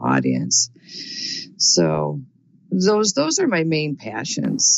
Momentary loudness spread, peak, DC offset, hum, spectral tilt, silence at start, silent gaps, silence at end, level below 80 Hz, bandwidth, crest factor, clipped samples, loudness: 11 LU; -6 dBFS; under 0.1%; none; -3 dB/octave; 0 s; none; 0 s; -60 dBFS; 8.2 kHz; 14 dB; under 0.1%; -19 LUFS